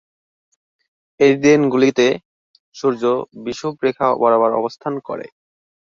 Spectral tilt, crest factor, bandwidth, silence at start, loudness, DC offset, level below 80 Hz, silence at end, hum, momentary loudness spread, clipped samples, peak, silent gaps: -5.5 dB/octave; 16 dB; 7.6 kHz; 1.2 s; -17 LUFS; under 0.1%; -62 dBFS; 0.7 s; none; 13 LU; under 0.1%; -2 dBFS; 2.25-2.54 s, 2.60-2.72 s